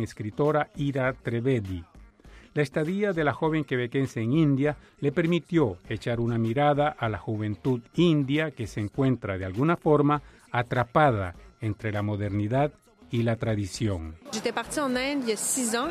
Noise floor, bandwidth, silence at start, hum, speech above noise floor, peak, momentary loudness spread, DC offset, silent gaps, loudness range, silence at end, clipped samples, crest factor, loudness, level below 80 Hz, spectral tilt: -51 dBFS; 15 kHz; 0 s; none; 25 dB; -8 dBFS; 9 LU; under 0.1%; none; 3 LU; 0 s; under 0.1%; 20 dB; -27 LUFS; -52 dBFS; -6 dB/octave